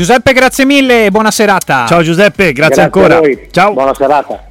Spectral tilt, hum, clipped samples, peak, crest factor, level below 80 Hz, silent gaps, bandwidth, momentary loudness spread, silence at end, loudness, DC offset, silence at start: -4.5 dB/octave; none; 0.2%; 0 dBFS; 8 dB; -36 dBFS; none; 17 kHz; 4 LU; 0.15 s; -8 LUFS; under 0.1%; 0 s